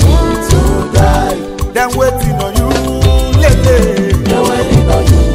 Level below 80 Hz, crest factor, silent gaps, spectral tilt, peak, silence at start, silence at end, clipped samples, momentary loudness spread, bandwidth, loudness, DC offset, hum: -14 dBFS; 8 dB; none; -6 dB/octave; 0 dBFS; 0 s; 0 s; under 0.1%; 5 LU; 16.5 kHz; -11 LUFS; under 0.1%; none